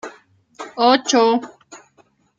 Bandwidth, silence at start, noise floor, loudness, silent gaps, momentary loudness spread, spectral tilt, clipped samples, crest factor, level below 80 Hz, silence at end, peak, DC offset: 9.2 kHz; 0.05 s; -58 dBFS; -16 LUFS; none; 23 LU; -2 dB/octave; under 0.1%; 18 dB; -68 dBFS; 0.6 s; -2 dBFS; under 0.1%